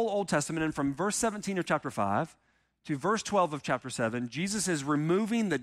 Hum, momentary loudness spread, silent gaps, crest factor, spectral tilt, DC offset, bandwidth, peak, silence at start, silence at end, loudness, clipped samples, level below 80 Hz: none; 5 LU; none; 16 dB; -4.5 dB/octave; under 0.1%; 15.5 kHz; -14 dBFS; 0 s; 0 s; -30 LUFS; under 0.1%; -62 dBFS